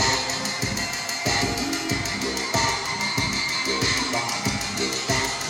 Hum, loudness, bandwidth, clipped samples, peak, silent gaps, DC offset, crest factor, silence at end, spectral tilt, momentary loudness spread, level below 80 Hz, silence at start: none; -23 LUFS; 17 kHz; under 0.1%; -8 dBFS; none; under 0.1%; 16 dB; 0 s; -2.5 dB/octave; 4 LU; -44 dBFS; 0 s